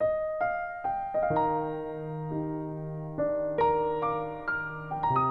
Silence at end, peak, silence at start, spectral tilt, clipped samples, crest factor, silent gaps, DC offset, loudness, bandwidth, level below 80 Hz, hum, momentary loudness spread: 0 s; -16 dBFS; 0 s; -9.5 dB/octave; under 0.1%; 14 dB; none; under 0.1%; -30 LUFS; 5.2 kHz; -56 dBFS; none; 9 LU